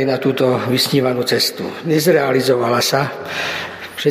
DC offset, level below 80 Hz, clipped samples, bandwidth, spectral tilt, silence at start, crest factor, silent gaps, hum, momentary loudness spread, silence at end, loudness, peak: under 0.1%; -58 dBFS; under 0.1%; 15.5 kHz; -4.5 dB/octave; 0 s; 14 dB; none; none; 8 LU; 0 s; -16 LUFS; -2 dBFS